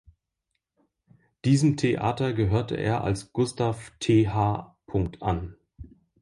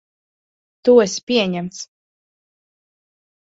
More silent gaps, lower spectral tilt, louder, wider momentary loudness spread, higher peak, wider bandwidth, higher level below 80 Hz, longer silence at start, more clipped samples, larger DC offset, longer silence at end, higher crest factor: second, none vs 1.23-1.27 s; first, -7 dB/octave vs -4.5 dB/octave; second, -26 LUFS vs -17 LUFS; second, 9 LU vs 19 LU; second, -10 dBFS vs -2 dBFS; first, 11.5 kHz vs 8 kHz; first, -46 dBFS vs -62 dBFS; first, 1.45 s vs 0.85 s; neither; neither; second, 0.4 s vs 1.6 s; about the same, 18 dB vs 20 dB